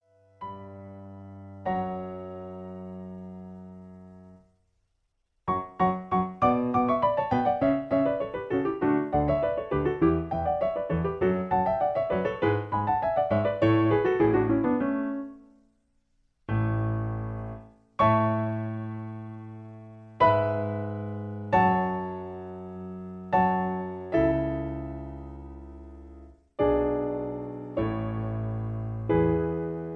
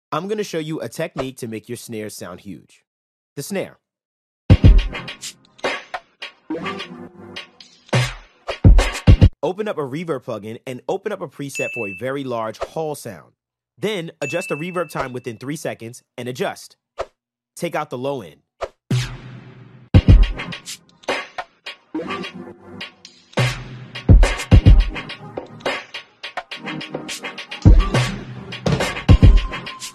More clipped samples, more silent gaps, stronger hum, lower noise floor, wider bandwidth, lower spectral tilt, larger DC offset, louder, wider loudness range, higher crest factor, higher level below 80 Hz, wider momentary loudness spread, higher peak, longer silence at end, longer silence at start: neither; second, none vs 2.87-3.36 s, 4.05-4.49 s; neither; first, -75 dBFS vs -61 dBFS; second, 5.8 kHz vs 13.5 kHz; first, -10 dB/octave vs -6 dB/octave; neither; second, -27 LUFS vs -21 LUFS; about the same, 12 LU vs 10 LU; about the same, 20 dB vs 18 dB; second, -48 dBFS vs -22 dBFS; about the same, 20 LU vs 20 LU; second, -8 dBFS vs 0 dBFS; about the same, 0 s vs 0.05 s; first, 0.4 s vs 0.1 s